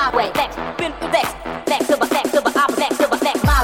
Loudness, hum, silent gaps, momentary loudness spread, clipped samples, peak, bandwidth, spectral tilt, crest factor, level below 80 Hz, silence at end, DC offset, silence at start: -18 LUFS; none; none; 7 LU; under 0.1%; -4 dBFS; 17 kHz; -4.5 dB/octave; 14 dB; -30 dBFS; 0 s; under 0.1%; 0 s